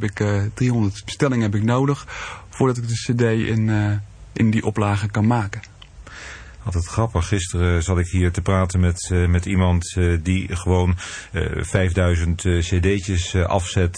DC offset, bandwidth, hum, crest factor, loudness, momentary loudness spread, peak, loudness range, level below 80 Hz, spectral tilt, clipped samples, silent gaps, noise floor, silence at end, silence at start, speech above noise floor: under 0.1%; 10 kHz; none; 18 dB; -21 LUFS; 9 LU; -2 dBFS; 3 LU; -34 dBFS; -6 dB/octave; under 0.1%; none; -40 dBFS; 0 s; 0 s; 21 dB